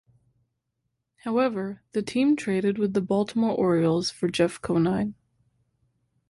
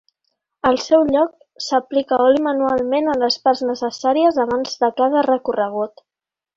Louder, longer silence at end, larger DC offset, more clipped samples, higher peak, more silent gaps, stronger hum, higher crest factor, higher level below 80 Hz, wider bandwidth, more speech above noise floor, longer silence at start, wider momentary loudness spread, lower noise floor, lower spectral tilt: second, -25 LUFS vs -18 LUFS; first, 1.15 s vs 0.7 s; neither; neither; second, -10 dBFS vs -2 dBFS; neither; neither; about the same, 18 dB vs 16 dB; about the same, -60 dBFS vs -56 dBFS; first, 11.5 kHz vs 7.6 kHz; second, 55 dB vs 71 dB; first, 1.25 s vs 0.65 s; about the same, 8 LU vs 7 LU; second, -79 dBFS vs -89 dBFS; first, -6.5 dB/octave vs -4 dB/octave